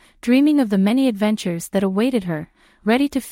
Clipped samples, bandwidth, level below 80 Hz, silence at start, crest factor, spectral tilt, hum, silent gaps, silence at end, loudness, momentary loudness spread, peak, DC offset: under 0.1%; 16.5 kHz; -54 dBFS; 0.25 s; 14 dB; -6 dB/octave; none; none; 0 s; -19 LUFS; 9 LU; -4 dBFS; under 0.1%